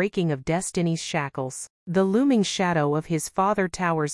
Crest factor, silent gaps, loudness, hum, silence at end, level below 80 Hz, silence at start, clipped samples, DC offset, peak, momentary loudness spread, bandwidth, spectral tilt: 16 dB; 1.70-1.86 s; -24 LUFS; none; 0 s; -56 dBFS; 0 s; under 0.1%; under 0.1%; -8 dBFS; 8 LU; 12 kHz; -5 dB/octave